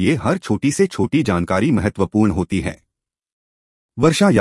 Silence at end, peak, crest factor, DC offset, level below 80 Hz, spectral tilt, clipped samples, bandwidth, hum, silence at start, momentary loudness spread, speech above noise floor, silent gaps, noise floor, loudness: 0 s; -2 dBFS; 16 dB; under 0.1%; -44 dBFS; -6 dB/octave; under 0.1%; 12 kHz; none; 0 s; 6 LU; over 73 dB; 3.32-3.89 s; under -90 dBFS; -18 LUFS